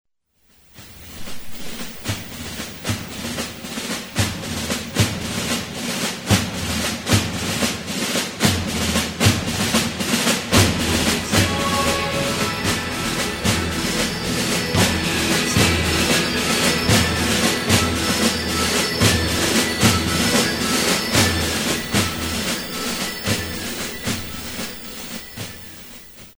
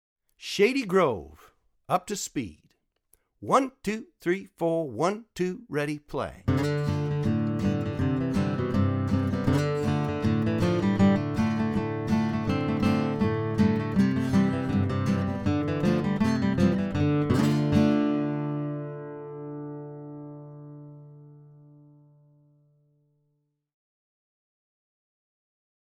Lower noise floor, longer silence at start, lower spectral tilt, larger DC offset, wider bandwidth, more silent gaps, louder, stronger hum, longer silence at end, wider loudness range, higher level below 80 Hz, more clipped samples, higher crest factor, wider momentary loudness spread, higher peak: second, -61 dBFS vs -75 dBFS; first, 0.75 s vs 0.4 s; second, -3.5 dB/octave vs -7 dB/octave; neither; first, over 20 kHz vs 15 kHz; neither; first, -20 LUFS vs -26 LUFS; neither; second, 0.05 s vs 4.5 s; about the same, 9 LU vs 8 LU; first, -38 dBFS vs -50 dBFS; neither; about the same, 20 dB vs 20 dB; about the same, 13 LU vs 14 LU; first, 0 dBFS vs -8 dBFS